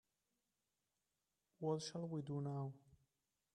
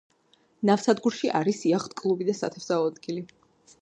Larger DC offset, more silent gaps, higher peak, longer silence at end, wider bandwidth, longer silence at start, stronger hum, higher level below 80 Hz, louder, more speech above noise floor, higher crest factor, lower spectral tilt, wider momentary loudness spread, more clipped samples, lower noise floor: neither; neither; second, -28 dBFS vs -8 dBFS; about the same, 0.6 s vs 0.55 s; about the same, 10.5 kHz vs 9.6 kHz; first, 1.6 s vs 0.6 s; neither; second, -86 dBFS vs -74 dBFS; second, -46 LUFS vs -26 LUFS; first, over 45 dB vs 39 dB; about the same, 20 dB vs 20 dB; about the same, -6.5 dB/octave vs -5.5 dB/octave; second, 7 LU vs 12 LU; neither; first, under -90 dBFS vs -65 dBFS